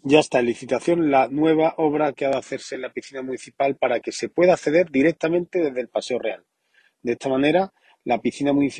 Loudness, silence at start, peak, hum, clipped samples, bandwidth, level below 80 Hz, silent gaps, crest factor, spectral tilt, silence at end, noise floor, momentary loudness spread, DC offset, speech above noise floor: -22 LUFS; 0.05 s; -2 dBFS; none; under 0.1%; 9.8 kHz; -64 dBFS; none; 20 dB; -5.5 dB/octave; 0 s; -62 dBFS; 13 LU; under 0.1%; 41 dB